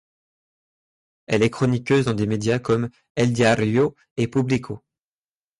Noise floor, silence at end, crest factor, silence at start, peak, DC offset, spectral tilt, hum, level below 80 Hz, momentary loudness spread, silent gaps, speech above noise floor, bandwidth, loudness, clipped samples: under -90 dBFS; 0.85 s; 16 dB; 1.3 s; -6 dBFS; under 0.1%; -6.5 dB/octave; none; -52 dBFS; 7 LU; 3.10-3.15 s, 4.11-4.16 s; over 69 dB; 11.5 kHz; -21 LUFS; under 0.1%